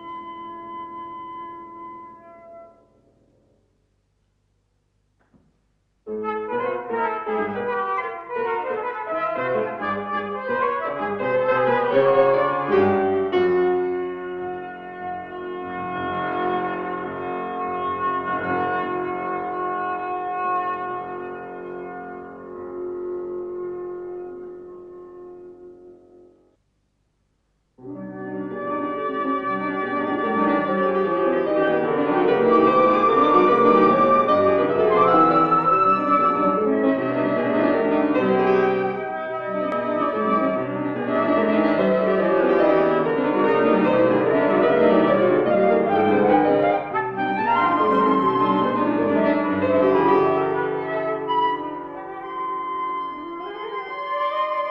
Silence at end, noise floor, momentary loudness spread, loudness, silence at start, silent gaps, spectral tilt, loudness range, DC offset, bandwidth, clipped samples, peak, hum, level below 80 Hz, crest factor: 0 s; -68 dBFS; 17 LU; -21 LUFS; 0 s; none; -8.5 dB/octave; 15 LU; under 0.1%; 6 kHz; under 0.1%; -4 dBFS; 50 Hz at -60 dBFS; -60 dBFS; 18 dB